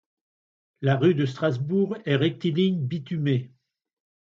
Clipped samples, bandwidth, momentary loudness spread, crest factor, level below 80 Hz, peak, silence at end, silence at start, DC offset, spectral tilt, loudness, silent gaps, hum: under 0.1%; 7.4 kHz; 7 LU; 18 dB; -68 dBFS; -8 dBFS; 0.85 s; 0.8 s; under 0.1%; -8.5 dB/octave; -25 LUFS; none; none